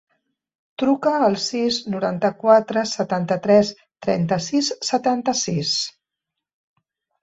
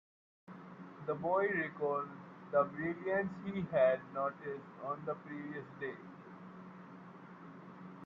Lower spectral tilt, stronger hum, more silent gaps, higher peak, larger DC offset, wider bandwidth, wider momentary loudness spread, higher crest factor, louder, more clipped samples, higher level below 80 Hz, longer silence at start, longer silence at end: second, -4.5 dB/octave vs -9 dB/octave; neither; neither; first, -2 dBFS vs -18 dBFS; neither; first, 8.2 kHz vs 6.2 kHz; second, 8 LU vs 20 LU; about the same, 18 dB vs 20 dB; first, -20 LUFS vs -37 LUFS; neither; first, -62 dBFS vs -78 dBFS; first, 0.8 s vs 0.5 s; first, 1.35 s vs 0 s